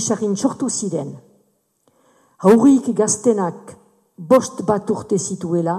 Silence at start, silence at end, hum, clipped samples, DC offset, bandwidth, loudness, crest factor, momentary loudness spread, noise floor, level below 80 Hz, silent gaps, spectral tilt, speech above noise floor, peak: 0 s; 0 s; none; under 0.1%; under 0.1%; 14.5 kHz; -18 LUFS; 16 dB; 13 LU; -63 dBFS; -62 dBFS; none; -5.5 dB/octave; 46 dB; -2 dBFS